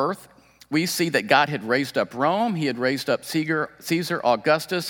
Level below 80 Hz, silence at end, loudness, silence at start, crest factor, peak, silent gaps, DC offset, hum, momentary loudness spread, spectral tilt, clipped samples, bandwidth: -68 dBFS; 0 s; -23 LUFS; 0 s; 22 dB; 0 dBFS; none; under 0.1%; none; 6 LU; -4.5 dB/octave; under 0.1%; 18 kHz